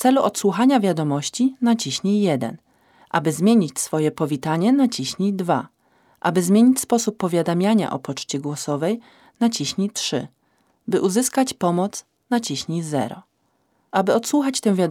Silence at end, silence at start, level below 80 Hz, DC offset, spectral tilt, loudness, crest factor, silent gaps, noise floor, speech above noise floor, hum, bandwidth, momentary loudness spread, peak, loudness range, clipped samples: 0 s; 0 s; -68 dBFS; under 0.1%; -5 dB/octave; -21 LUFS; 18 dB; none; -67 dBFS; 47 dB; none; 16.5 kHz; 9 LU; -2 dBFS; 3 LU; under 0.1%